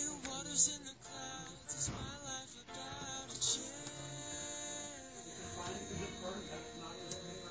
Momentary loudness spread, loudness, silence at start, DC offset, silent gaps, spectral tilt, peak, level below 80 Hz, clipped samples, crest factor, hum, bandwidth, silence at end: 13 LU; -40 LUFS; 0 s; under 0.1%; none; -2 dB/octave; -20 dBFS; -62 dBFS; under 0.1%; 24 dB; none; 8 kHz; 0 s